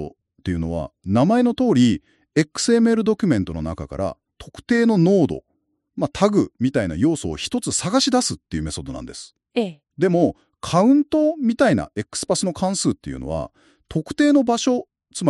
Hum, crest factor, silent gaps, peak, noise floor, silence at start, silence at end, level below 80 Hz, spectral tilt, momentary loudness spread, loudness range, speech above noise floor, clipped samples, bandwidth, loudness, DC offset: none; 18 dB; none; -2 dBFS; -52 dBFS; 0 s; 0 s; -44 dBFS; -5.5 dB/octave; 13 LU; 3 LU; 32 dB; under 0.1%; 12 kHz; -20 LUFS; under 0.1%